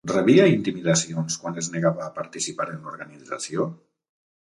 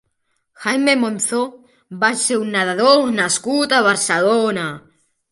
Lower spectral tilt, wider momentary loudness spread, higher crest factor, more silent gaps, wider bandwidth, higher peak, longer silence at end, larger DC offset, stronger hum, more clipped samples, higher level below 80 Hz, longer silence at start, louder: first, -5 dB/octave vs -2.5 dB/octave; first, 17 LU vs 12 LU; about the same, 20 dB vs 16 dB; neither; about the same, 11.5 kHz vs 11.5 kHz; about the same, -4 dBFS vs -2 dBFS; first, 0.85 s vs 0.55 s; neither; neither; neither; about the same, -64 dBFS vs -66 dBFS; second, 0.05 s vs 0.6 s; second, -23 LUFS vs -17 LUFS